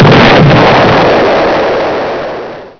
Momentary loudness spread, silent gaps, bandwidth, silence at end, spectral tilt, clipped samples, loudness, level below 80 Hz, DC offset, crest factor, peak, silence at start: 13 LU; none; 5.4 kHz; 0.1 s; -7 dB/octave; 0.2%; -6 LUFS; -30 dBFS; under 0.1%; 6 dB; 0 dBFS; 0 s